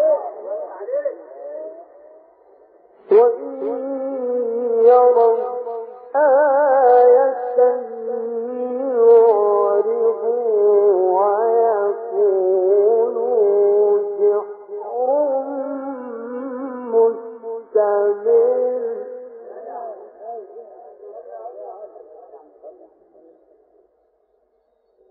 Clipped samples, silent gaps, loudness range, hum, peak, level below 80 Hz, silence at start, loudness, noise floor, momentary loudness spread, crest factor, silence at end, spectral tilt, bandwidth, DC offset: under 0.1%; none; 11 LU; none; -2 dBFS; -78 dBFS; 0 s; -17 LUFS; -64 dBFS; 21 LU; 16 dB; 2.4 s; -5 dB/octave; 2.6 kHz; under 0.1%